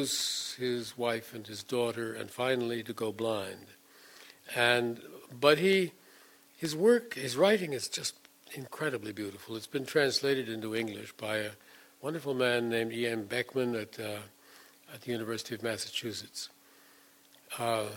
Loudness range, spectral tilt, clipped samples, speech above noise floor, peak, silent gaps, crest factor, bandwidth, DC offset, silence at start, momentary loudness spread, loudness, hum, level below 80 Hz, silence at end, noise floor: 8 LU; -3.5 dB/octave; under 0.1%; 29 dB; -10 dBFS; none; 24 dB; 17.5 kHz; under 0.1%; 0 s; 16 LU; -32 LUFS; none; -78 dBFS; 0 s; -61 dBFS